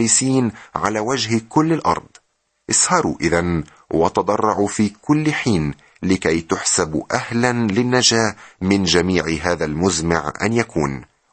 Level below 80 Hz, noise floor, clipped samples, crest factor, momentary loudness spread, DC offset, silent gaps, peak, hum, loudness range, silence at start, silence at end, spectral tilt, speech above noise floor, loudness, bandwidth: -44 dBFS; -66 dBFS; under 0.1%; 18 dB; 8 LU; under 0.1%; none; -2 dBFS; none; 2 LU; 0 s; 0.3 s; -4 dB/octave; 47 dB; -18 LUFS; 9 kHz